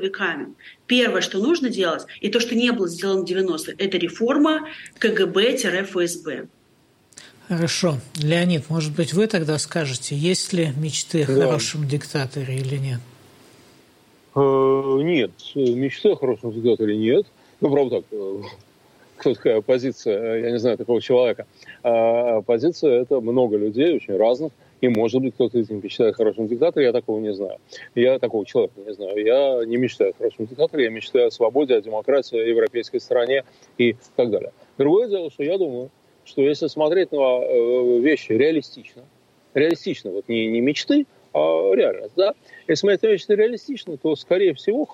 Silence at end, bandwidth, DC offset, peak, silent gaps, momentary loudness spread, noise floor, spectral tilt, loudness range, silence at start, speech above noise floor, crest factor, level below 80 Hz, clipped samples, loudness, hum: 0 s; 12.5 kHz; under 0.1%; -6 dBFS; none; 8 LU; -58 dBFS; -5.5 dB/octave; 3 LU; 0 s; 38 dB; 14 dB; -68 dBFS; under 0.1%; -21 LUFS; none